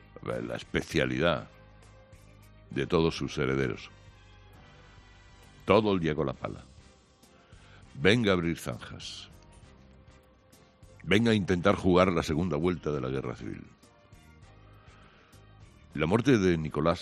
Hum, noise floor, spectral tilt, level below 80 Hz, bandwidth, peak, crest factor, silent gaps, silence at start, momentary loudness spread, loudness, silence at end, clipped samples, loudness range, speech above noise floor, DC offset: none; -59 dBFS; -6 dB/octave; -54 dBFS; 13 kHz; -6 dBFS; 24 dB; none; 0.25 s; 17 LU; -28 LUFS; 0 s; under 0.1%; 6 LU; 32 dB; under 0.1%